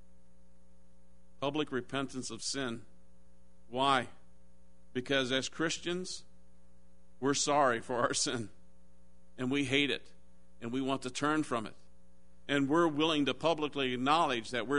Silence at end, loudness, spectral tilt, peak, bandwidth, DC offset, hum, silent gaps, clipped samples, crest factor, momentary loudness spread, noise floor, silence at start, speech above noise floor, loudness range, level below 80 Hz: 0 s; -33 LUFS; -3.5 dB/octave; -12 dBFS; 10.5 kHz; 0.4%; none; none; under 0.1%; 22 dB; 13 LU; -64 dBFS; 1.4 s; 32 dB; 5 LU; -66 dBFS